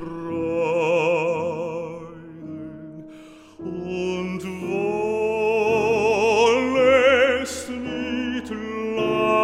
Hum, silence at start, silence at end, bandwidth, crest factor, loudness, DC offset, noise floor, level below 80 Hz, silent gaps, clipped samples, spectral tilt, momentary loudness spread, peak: none; 0 s; 0 s; 14 kHz; 16 dB; -22 LUFS; under 0.1%; -44 dBFS; -54 dBFS; none; under 0.1%; -5 dB/octave; 19 LU; -6 dBFS